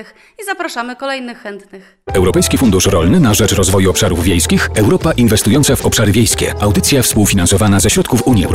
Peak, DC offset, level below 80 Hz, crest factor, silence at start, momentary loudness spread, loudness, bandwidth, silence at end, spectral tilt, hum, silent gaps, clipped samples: -2 dBFS; 1%; -28 dBFS; 10 dB; 0 s; 11 LU; -12 LUFS; 16.5 kHz; 0 s; -4.5 dB/octave; none; none; under 0.1%